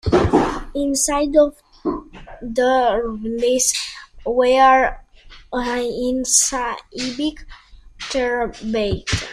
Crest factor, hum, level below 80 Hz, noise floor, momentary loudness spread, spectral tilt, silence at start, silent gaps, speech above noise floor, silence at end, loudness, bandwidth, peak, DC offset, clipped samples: 18 dB; none; -38 dBFS; -43 dBFS; 12 LU; -3 dB/octave; 0.05 s; none; 24 dB; 0 s; -19 LUFS; 15.5 kHz; 0 dBFS; under 0.1%; under 0.1%